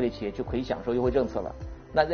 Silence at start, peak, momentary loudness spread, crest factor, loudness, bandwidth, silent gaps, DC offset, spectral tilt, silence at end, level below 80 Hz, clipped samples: 0 s; -10 dBFS; 10 LU; 18 dB; -29 LUFS; 6.8 kHz; none; under 0.1%; -5.5 dB/octave; 0 s; -42 dBFS; under 0.1%